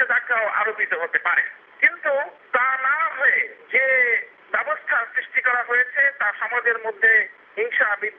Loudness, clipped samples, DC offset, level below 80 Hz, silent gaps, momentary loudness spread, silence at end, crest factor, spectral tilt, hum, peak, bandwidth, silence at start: -20 LUFS; under 0.1%; under 0.1%; -86 dBFS; none; 7 LU; 0.05 s; 18 dB; 2.5 dB/octave; none; -4 dBFS; 3.9 kHz; 0 s